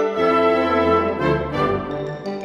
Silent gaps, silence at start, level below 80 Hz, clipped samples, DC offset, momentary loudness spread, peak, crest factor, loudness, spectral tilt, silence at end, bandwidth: none; 0 s; -42 dBFS; under 0.1%; under 0.1%; 10 LU; -6 dBFS; 14 dB; -19 LUFS; -7.5 dB/octave; 0 s; 9 kHz